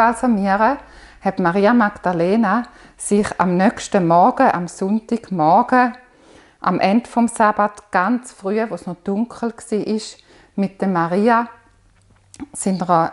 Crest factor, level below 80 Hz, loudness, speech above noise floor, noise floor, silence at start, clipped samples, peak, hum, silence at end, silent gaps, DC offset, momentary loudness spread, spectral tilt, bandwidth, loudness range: 18 dB; -52 dBFS; -18 LUFS; 36 dB; -53 dBFS; 0 s; under 0.1%; 0 dBFS; none; 0 s; none; under 0.1%; 11 LU; -6 dB/octave; 11.5 kHz; 5 LU